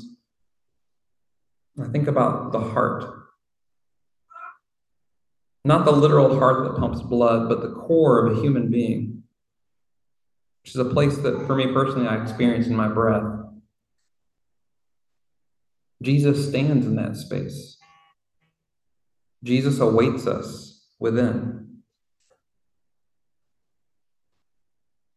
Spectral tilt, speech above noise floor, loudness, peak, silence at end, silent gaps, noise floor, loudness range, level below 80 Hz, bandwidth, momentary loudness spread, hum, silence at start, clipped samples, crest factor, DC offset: -8 dB/octave; 67 dB; -21 LUFS; -4 dBFS; 3.5 s; none; -87 dBFS; 9 LU; -52 dBFS; 12.5 kHz; 17 LU; none; 0 s; under 0.1%; 20 dB; under 0.1%